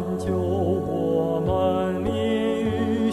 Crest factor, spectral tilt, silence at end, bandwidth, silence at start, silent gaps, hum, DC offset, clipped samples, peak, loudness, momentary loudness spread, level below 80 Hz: 12 dB; -7.5 dB/octave; 0 s; 13.5 kHz; 0 s; none; none; 0.2%; under 0.1%; -10 dBFS; -24 LUFS; 3 LU; -48 dBFS